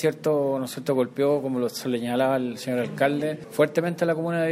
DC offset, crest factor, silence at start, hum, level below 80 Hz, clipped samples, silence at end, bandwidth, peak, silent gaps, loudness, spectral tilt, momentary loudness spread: under 0.1%; 18 dB; 0 s; none; -72 dBFS; under 0.1%; 0 s; 16 kHz; -8 dBFS; none; -25 LUFS; -6 dB/octave; 5 LU